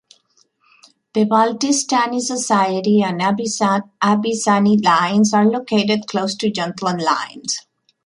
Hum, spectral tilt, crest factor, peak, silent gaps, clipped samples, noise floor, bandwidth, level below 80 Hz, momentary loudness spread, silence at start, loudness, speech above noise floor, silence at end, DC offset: none; -4 dB/octave; 16 dB; -2 dBFS; none; under 0.1%; -60 dBFS; 11.5 kHz; -64 dBFS; 7 LU; 1.15 s; -17 LUFS; 43 dB; 0.45 s; under 0.1%